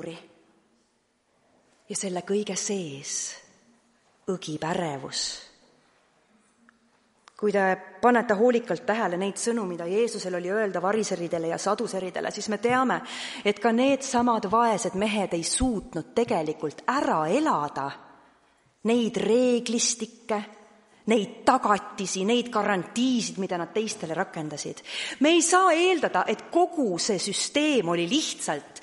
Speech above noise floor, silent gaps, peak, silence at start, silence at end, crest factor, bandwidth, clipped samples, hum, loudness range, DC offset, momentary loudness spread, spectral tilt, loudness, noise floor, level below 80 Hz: 44 dB; none; -6 dBFS; 0 s; 0.05 s; 20 dB; 11.5 kHz; under 0.1%; none; 9 LU; under 0.1%; 10 LU; -3.5 dB/octave; -26 LUFS; -70 dBFS; -56 dBFS